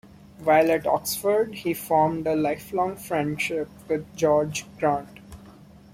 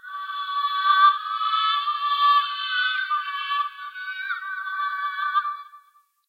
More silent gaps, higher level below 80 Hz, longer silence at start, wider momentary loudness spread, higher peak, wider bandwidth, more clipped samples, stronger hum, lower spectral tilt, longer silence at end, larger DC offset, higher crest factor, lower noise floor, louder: neither; first, -56 dBFS vs under -90 dBFS; first, 0.4 s vs 0.05 s; second, 9 LU vs 12 LU; about the same, -8 dBFS vs -6 dBFS; first, 16.5 kHz vs 14.5 kHz; neither; neither; first, -5 dB/octave vs 8.5 dB/octave; second, 0.3 s vs 0.5 s; neither; about the same, 18 dB vs 18 dB; second, -48 dBFS vs -59 dBFS; about the same, -24 LUFS vs -23 LUFS